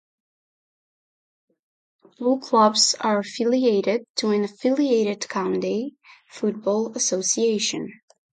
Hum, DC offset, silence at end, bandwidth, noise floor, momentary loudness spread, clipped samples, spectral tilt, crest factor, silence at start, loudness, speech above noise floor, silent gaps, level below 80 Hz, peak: none; under 0.1%; 0.4 s; 9.6 kHz; under -90 dBFS; 9 LU; under 0.1%; -3 dB/octave; 18 dB; 2.2 s; -22 LUFS; over 68 dB; 4.10-4.15 s; -74 dBFS; -6 dBFS